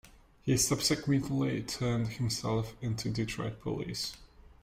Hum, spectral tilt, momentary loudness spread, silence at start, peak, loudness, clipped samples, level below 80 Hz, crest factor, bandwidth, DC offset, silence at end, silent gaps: none; -4.5 dB/octave; 9 LU; 0.05 s; -16 dBFS; -32 LUFS; under 0.1%; -54 dBFS; 18 dB; 16 kHz; under 0.1%; 0.2 s; none